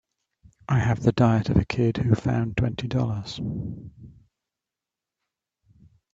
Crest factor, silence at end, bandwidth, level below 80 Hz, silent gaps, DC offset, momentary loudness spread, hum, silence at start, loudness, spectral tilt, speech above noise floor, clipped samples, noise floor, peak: 20 dB; 2.05 s; 7.6 kHz; -46 dBFS; none; under 0.1%; 14 LU; none; 0.7 s; -24 LUFS; -8 dB/octave; 65 dB; under 0.1%; -88 dBFS; -6 dBFS